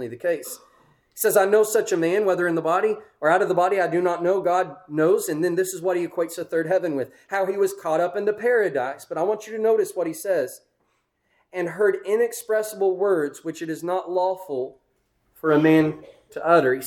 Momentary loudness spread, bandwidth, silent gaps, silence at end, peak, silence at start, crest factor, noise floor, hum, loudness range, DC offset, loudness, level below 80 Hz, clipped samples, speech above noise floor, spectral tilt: 10 LU; 19 kHz; none; 0 s; -6 dBFS; 0 s; 18 dB; -70 dBFS; none; 4 LU; under 0.1%; -23 LUFS; -70 dBFS; under 0.1%; 48 dB; -5 dB/octave